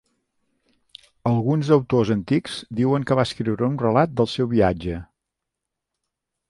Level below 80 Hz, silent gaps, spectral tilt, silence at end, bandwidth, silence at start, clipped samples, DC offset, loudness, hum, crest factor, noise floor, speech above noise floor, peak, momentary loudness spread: -48 dBFS; none; -7.5 dB/octave; 1.45 s; 11.5 kHz; 1.25 s; under 0.1%; under 0.1%; -21 LUFS; none; 18 dB; -83 dBFS; 63 dB; -4 dBFS; 10 LU